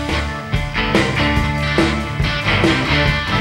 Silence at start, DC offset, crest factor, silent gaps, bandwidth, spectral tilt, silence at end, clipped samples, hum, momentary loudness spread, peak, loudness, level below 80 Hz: 0 s; under 0.1%; 16 dB; none; 16 kHz; -5.5 dB/octave; 0 s; under 0.1%; none; 6 LU; 0 dBFS; -17 LUFS; -26 dBFS